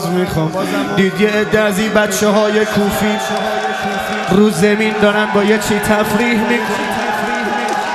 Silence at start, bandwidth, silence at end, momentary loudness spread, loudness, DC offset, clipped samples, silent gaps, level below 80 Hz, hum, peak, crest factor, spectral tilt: 0 s; 13.5 kHz; 0 s; 5 LU; -14 LUFS; under 0.1%; under 0.1%; none; -44 dBFS; none; 0 dBFS; 14 dB; -4.5 dB/octave